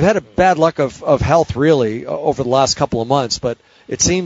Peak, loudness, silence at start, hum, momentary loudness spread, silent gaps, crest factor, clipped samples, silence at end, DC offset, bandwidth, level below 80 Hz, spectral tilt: 0 dBFS; -16 LUFS; 0 s; none; 7 LU; none; 16 dB; under 0.1%; 0 s; under 0.1%; 8 kHz; -38 dBFS; -4.5 dB/octave